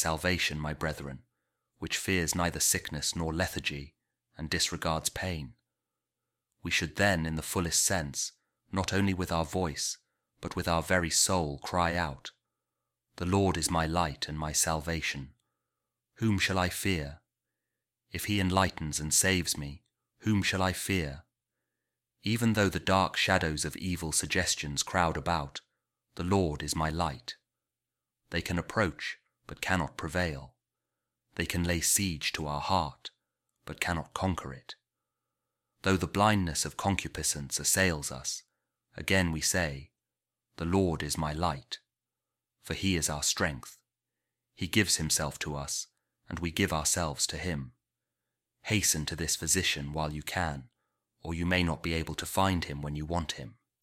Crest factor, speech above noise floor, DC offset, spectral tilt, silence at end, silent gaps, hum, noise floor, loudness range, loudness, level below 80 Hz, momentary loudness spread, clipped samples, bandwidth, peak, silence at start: 22 dB; over 59 dB; under 0.1%; -3.5 dB/octave; 0.3 s; none; none; under -90 dBFS; 5 LU; -30 LUFS; -50 dBFS; 16 LU; under 0.1%; 17 kHz; -10 dBFS; 0 s